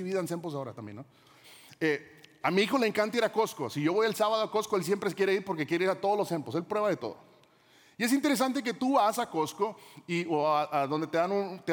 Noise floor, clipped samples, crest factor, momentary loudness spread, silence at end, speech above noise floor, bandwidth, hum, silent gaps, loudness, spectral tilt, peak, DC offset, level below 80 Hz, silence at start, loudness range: -61 dBFS; under 0.1%; 18 dB; 9 LU; 0 s; 32 dB; 19.5 kHz; none; none; -29 LUFS; -5 dB/octave; -12 dBFS; under 0.1%; -80 dBFS; 0 s; 2 LU